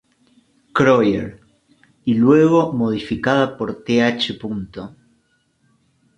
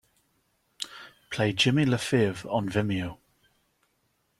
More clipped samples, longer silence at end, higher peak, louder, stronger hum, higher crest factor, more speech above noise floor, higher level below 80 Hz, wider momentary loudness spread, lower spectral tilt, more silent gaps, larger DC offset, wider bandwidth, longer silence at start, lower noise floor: neither; about the same, 1.3 s vs 1.25 s; first, -2 dBFS vs -10 dBFS; first, -18 LUFS vs -27 LUFS; neither; about the same, 18 dB vs 20 dB; about the same, 47 dB vs 47 dB; first, -52 dBFS vs -60 dBFS; about the same, 15 LU vs 16 LU; about the same, -6.5 dB/octave vs -5.5 dB/octave; neither; neither; second, 9 kHz vs 15.5 kHz; about the same, 0.75 s vs 0.8 s; second, -63 dBFS vs -73 dBFS